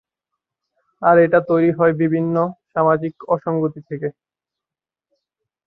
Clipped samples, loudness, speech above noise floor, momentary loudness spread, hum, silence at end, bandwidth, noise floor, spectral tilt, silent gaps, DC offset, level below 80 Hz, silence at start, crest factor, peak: under 0.1%; -18 LUFS; 72 dB; 13 LU; none; 1.55 s; 4.1 kHz; -89 dBFS; -11.5 dB/octave; none; under 0.1%; -62 dBFS; 1 s; 18 dB; -2 dBFS